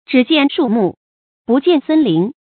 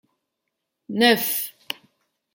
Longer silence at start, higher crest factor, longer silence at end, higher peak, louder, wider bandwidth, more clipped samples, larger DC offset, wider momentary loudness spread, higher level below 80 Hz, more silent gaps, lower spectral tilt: second, 0.1 s vs 0.9 s; second, 14 dB vs 22 dB; second, 0.25 s vs 0.6 s; first, 0 dBFS vs -4 dBFS; first, -14 LUFS vs -21 LUFS; second, 4.6 kHz vs 17 kHz; neither; neither; second, 5 LU vs 17 LU; first, -62 dBFS vs -76 dBFS; first, 0.97-1.45 s vs none; first, -11.5 dB/octave vs -2.5 dB/octave